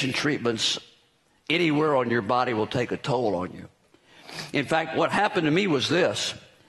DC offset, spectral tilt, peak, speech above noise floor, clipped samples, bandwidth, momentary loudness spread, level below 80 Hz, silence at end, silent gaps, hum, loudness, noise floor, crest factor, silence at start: under 0.1%; -4.5 dB/octave; -8 dBFS; 39 dB; under 0.1%; 12 kHz; 9 LU; -64 dBFS; 0.3 s; none; none; -25 LUFS; -64 dBFS; 18 dB; 0 s